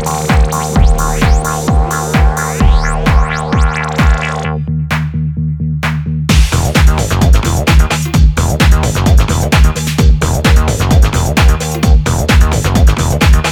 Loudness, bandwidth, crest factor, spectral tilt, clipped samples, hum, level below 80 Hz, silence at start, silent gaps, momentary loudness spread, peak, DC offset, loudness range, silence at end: -12 LUFS; 17.5 kHz; 10 dB; -5 dB/octave; under 0.1%; none; -12 dBFS; 0 s; none; 5 LU; 0 dBFS; 0.2%; 3 LU; 0 s